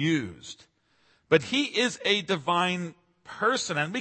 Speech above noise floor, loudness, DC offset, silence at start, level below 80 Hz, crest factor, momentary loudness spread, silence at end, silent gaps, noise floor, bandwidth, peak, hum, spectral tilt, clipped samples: 39 dB; -26 LUFS; under 0.1%; 0 s; -68 dBFS; 22 dB; 19 LU; 0 s; none; -66 dBFS; 8.8 kHz; -6 dBFS; none; -4 dB/octave; under 0.1%